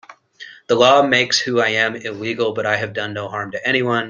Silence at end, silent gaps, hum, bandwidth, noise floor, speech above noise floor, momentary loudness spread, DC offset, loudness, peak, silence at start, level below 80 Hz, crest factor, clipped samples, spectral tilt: 0 s; none; none; 10 kHz; -41 dBFS; 23 dB; 13 LU; under 0.1%; -17 LUFS; 0 dBFS; 0.1 s; -62 dBFS; 18 dB; under 0.1%; -3.5 dB/octave